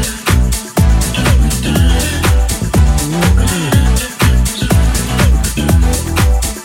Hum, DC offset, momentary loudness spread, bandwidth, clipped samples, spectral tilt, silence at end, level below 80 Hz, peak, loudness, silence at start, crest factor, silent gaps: none; under 0.1%; 2 LU; 17 kHz; under 0.1%; -4.5 dB/octave; 0 s; -14 dBFS; 0 dBFS; -13 LUFS; 0 s; 12 dB; none